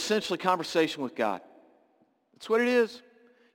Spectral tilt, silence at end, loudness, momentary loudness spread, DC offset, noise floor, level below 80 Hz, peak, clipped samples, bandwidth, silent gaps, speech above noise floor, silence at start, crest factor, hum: -4 dB/octave; 0.55 s; -28 LUFS; 13 LU; under 0.1%; -68 dBFS; -76 dBFS; -10 dBFS; under 0.1%; 17 kHz; none; 40 dB; 0 s; 20 dB; none